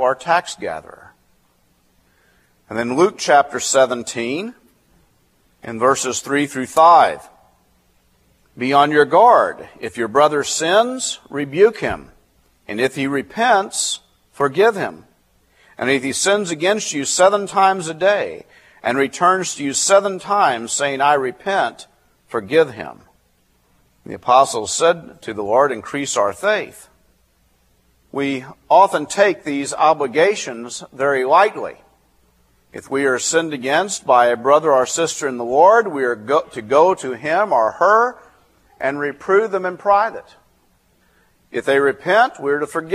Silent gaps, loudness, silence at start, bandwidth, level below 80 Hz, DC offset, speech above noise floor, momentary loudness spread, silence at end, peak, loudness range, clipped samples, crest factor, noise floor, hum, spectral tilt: none; -17 LUFS; 0 s; 15 kHz; -60 dBFS; under 0.1%; 43 dB; 14 LU; 0 s; 0 dBFS; 5 LU; under 0.1%; 18 dB; -60 dBFS; none; -3 dB/octave